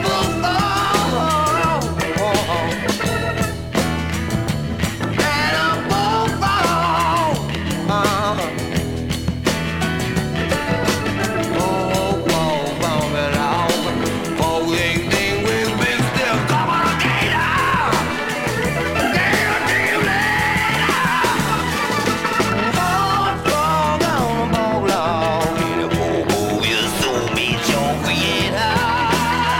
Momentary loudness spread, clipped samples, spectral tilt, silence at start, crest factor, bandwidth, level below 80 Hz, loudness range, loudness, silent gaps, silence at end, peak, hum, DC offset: 5 LU; under 0.1%; -4.5 dB/octave; 0 s; 16 dB; 18 kHz; -36 dBFS; 3 LU; -18 LUFS; none; 0 s; -2 dBFS; none; under 0.1%